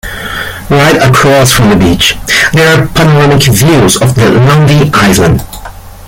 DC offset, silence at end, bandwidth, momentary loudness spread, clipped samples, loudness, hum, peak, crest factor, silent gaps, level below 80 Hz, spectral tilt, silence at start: under 0.1%; 0 s; 17 kHz; 10 LU; 0.4%; -6 LUFS; none; 0 dBFS; 6 dB; none; -26 dBFS; -4.5 dB/octave; 0.05 s